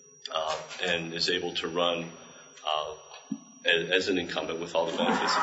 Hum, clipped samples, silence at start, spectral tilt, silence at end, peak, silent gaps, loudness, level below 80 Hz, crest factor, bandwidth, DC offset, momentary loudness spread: none; under 0.1%; 0.25 s; -3 dB/octave; 0 s; -10 dBFS; none; -29 LUFS; -68 dBFS; 20 dB; 8 kHz; under 0.1%; 15 LU